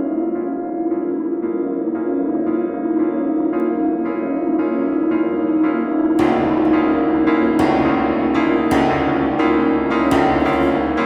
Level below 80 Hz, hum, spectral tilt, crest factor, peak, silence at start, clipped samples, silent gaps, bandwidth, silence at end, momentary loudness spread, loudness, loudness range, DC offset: -42 dBFS; none; -7 dB/octave; 14 dB; -4 dBFS; 0 s; under 0.1%; none; 11 kHz; 0 s; 6 LU; -18 LUFS; 4 LU; under 0.1%